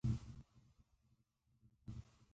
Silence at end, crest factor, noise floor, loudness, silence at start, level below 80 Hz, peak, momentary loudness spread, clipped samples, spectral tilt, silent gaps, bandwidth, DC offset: 0.1 s; 22 dB; -80 dBFS; -50 LUFS; 0.05 s; -58 dBFS; -28 dBFS; 17 LU; under 0.1%; -8 dB/octave; none; 8 kHz; under 0.1%